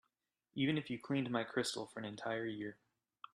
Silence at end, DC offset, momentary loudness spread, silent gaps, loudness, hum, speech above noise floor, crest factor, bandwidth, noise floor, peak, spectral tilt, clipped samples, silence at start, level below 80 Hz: 0.6 s; under 0.1%; 11 LU; none; -40 LUFS; none; 46 dB; 20 dB; 13 kHz; -86 dBFS; -22 dBFS; -5 dB/octave; under 0.1%; 0.55 s; -78 dBFS